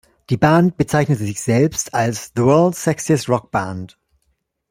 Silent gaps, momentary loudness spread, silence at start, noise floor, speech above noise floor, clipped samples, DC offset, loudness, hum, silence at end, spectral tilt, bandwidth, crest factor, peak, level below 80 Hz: none; 9 LU; 0.3 s; -68 dBFS; 51 dB; under 0.1%; under 0.1%; -17 LUFS; none; 0.85 s; -6 dB/octave; 16 kHz; 16 dB; -2 dBFS; -50 dBFS